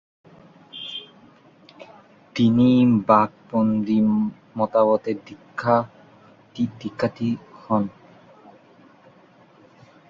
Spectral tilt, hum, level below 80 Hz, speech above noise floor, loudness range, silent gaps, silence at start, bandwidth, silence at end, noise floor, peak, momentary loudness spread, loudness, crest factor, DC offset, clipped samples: -8 dB/octave; none; -60 dBFS; 33 dB; 9 LU; none; 0.75 s; 7 kHz; 2.2 s; -53 dBFS; -2 dBFS; 17 LU; -22 LUFS; 22 dB; under 0.1%; under 0.1%